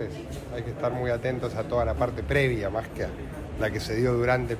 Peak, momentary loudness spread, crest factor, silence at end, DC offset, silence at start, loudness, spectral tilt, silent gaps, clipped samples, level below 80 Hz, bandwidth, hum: -10 dBFS; 11 LU; 16 dB; 0 s; under 0.1%; 0 s; -28 LUFS; -6.5 dB/octave; none; under 0.1%; -40 dBFS; 15.5 kHz; none